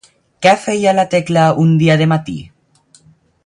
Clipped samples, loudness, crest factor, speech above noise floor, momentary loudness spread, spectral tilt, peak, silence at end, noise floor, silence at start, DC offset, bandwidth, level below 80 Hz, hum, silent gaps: under 0.1%; -13 LUFS; 14 dB; 39 dB; 7 LU; -6 dB/octave; 0 dBFS; 1 s; -51 dBFS; 0.4 s; under 0.1%; 10.5 kHz; -52 dBFS; none; none